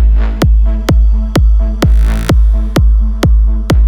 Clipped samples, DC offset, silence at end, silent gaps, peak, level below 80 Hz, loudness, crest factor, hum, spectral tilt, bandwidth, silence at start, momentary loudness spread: under 0.1%; under 0.1%; 0 s; none; 0 dBFS; -8 dBFS; -12 LUFS; 8 dB; none; -7 dB/octave; 12.5 kHz; 0 s; 1 LU